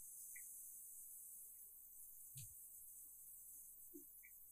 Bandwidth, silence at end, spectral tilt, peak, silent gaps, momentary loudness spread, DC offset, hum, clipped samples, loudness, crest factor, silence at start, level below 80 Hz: 15.5 kHz; 0 s; -2 dB/octave; -40 dBFS; none; 5 LU; under 0.1%; none; under 0.1%; -56 LUFS; 18 dB; 0 s; -84 dBFS